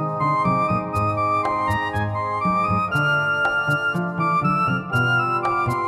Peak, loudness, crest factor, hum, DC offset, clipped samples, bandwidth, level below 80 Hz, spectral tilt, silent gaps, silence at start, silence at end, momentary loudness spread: -8 dBFS; -21 LUFS; 12 dB; none; under 0.1%; under 0.1%; 15 kHz; -48 dBFS; -6.5 dB/octave; none; 0 s; 0 s; 4 LU